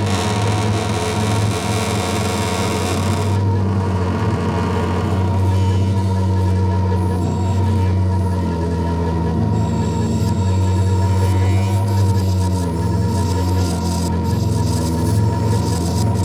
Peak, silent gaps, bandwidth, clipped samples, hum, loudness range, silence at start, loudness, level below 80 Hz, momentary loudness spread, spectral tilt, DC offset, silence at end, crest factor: -4 dBFS; none; 13.5 kHz; under 0.1%; none; 1 LU; 0 s; -18 LUFS; -34 dBFS; 3 LU; -6.5 dB/octave; under 0.1%; 0 s; 12 dB